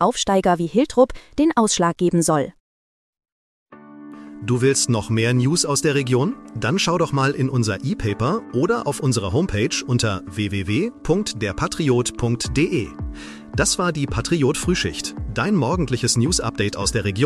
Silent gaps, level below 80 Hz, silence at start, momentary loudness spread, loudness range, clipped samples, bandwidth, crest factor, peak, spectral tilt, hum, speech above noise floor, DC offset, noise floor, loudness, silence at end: 2.60-3.13 s, 3.32-3.66 s; -40 dBFS; 0 s; 7 LU; 3 LU; under 0.1%; 14.5 kHz; 18 dB; -2 dBFS; -4.5 dB/octave; none; 20 dB; under 0.1%; -40 dBFS; -20 LUFS; 0 s